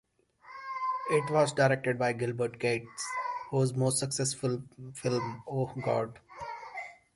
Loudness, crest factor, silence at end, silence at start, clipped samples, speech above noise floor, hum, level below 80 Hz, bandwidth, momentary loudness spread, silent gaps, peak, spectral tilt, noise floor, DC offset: -31 LUFS; 18 dB; 0.2 s; 0.45 s; under 0.1%; 26 dB; none; -68 dBFS; 11.5 kHz; 15 LU; none; -12 dBFS; -5 dB/octave; -56 dBFS; under 0.1%